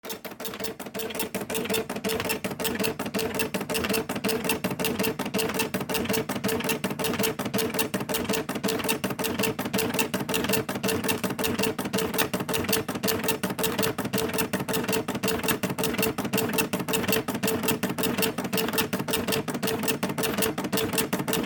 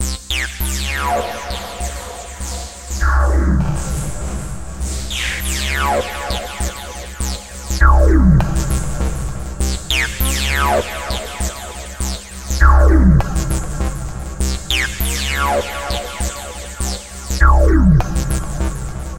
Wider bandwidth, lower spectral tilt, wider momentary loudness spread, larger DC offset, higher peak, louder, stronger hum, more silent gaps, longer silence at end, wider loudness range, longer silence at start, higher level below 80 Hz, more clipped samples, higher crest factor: first, 19 kHz vs 17 kHz; about the same, -3.5 dB/octave vs -4.5 dB/octave; second, 3 LU vs 14 LU; second, under 0.1% vs 0.9%; second, -6 dBFS vs 0 dBFS; second, -27 LUFS vs -18 LUFS; neither; neither; about the same, 0 s vs 0 s; about the same, 2 LU vs 4 LU; about the same, 0.05 s vs 0 s; second, -56 dBFS vs -18 dBFS; neither; about the same, 20 dB vs 16 dB